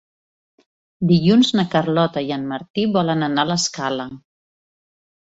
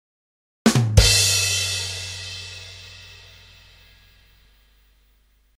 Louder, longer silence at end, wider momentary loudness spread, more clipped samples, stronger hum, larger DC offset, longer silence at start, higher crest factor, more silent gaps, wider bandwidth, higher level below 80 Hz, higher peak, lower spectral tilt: about the same, -19 LUFS vs -19 LUFS; second, 1.15 s vs 2.45 s; second, 11 LU vs 24 LU; neither; second, none vs 50 Hz at -55 dBFS; neither; first, 1 s vs 0.65 s; second, 18 dB vs 24 dB; first, 2.70-2.74 s vs none; second, 8 kHz vs 16 kHz; second, -58 dBFS vs -32 dBFS; second, -4 dBFS vs 0 dBFS; first, -5.5 dB/octave vs -3 dB/octave